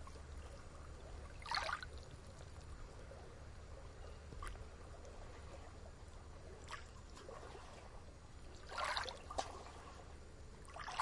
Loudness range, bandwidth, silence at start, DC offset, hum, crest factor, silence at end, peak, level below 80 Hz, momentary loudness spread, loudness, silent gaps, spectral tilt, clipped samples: 7 LU; 11.5 kHz; 0 s; under 0.1%; none; 26 dB; 0 s; -24 dBFS; -56 dBFS; 15 LU; -50 LUFS; none; -3.5 dB/octave; under 0.1%